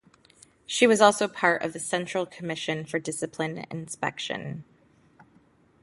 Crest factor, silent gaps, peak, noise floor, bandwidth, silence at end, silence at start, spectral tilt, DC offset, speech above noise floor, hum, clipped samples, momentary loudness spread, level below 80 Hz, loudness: 24 dB; none; -4 dBFS; -61 dBFS; 11.5 kHz; 1.2 s; 0.7 s; -3.5 dB/octave; under 0.1%; 35 dB; none; under 0.1%; 15 LU; -70 dBFS; -26 LUFS